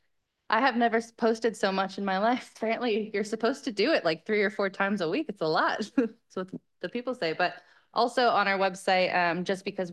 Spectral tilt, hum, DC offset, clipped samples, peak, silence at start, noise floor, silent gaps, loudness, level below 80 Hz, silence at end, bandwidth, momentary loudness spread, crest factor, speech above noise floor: -5 dB/octave; none; under 0.1%; under 0.1%; -10 dBFS; 0.5 s; -76 dBFS; none; -28 LUFS; -78 dBFS; 0 s; 12.5 kHz; 9 LU; 18 dB; 49 dB